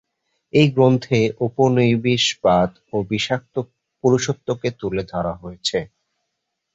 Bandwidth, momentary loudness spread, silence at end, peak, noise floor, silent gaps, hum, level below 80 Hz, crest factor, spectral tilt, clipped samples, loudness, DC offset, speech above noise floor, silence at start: 8 kHz; 11 LU; 0.9 s; -2 dBFS; -77 dBFS; none; none; -50 dBFS; 18 dB; -5.5 dB/octave; under 0.1%; -20 LUFS; under 0.1%; 58 dB; 0.55 s